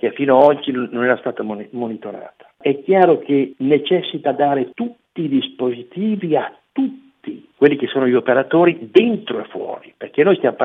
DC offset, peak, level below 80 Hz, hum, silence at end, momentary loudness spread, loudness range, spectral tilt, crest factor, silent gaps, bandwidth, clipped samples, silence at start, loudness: under 0.1%; 0 dBFS; -72 dBFS; none; 0 s; 14 LU; 4 LU; -8.5 dB/octave; 18 dB; none; 4.6 kHz; under 0.1%; 0.05 s; -17 LUFS